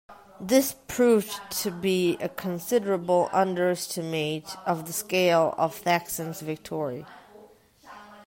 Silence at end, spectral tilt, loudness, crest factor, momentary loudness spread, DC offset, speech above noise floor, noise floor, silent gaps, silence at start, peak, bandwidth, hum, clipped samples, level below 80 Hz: 0.05 s; -4.5 dB/octave; -26 LUFS; 20 dB; 11 LU; under 0.1%; 28 dB; -54 dBFS; none; 0.1 s; -6 dBFS; 16.5 kHz; none; under 0.1%; -64 dBFS